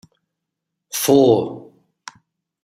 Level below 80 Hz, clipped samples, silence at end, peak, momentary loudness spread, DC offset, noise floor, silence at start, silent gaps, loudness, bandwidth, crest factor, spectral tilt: -60 dBFS; under 0.1%; 1.05 s; -2 dBFS; 17 LU; under 0.1%; -80 dBFS; 0.95 s; none; -16 LUFS; 16 kHz; 18 dB; -5 dB/octave